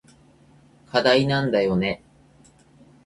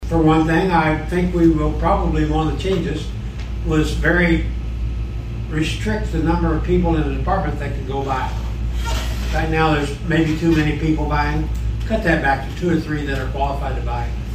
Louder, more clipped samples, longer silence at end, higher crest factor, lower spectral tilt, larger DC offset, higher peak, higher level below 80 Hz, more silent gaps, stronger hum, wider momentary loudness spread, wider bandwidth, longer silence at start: about the same, -21 LUFS vs -20 LUFS; neither; first, 1.1 s vs 0 s; first, 20 dB vs 14 dB; about the same, -6 dB/octave vs -7 dB/octave; neither; about the same, -6 dBFS vs -4 dBFS; second, -54 dBFS vs -24 dBFS; neither; neither; about the same, 9 LU vs 9 LU; second, 11.5 kHz vs 14 kHz; first, 0.95 s vs 0 s